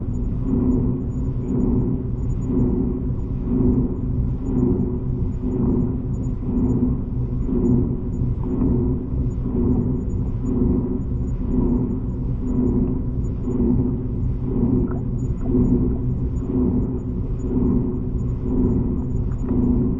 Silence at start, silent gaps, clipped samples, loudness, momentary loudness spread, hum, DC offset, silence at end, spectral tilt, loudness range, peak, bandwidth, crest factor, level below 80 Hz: 0 s; none; under 0.1%; -22 LUFS; 5 LU; none; under 0.1%; 0 s; -12 dB/octave; 1 LU; -6 dBFS; 7.4 kHz; 14 dB; -26 dBFS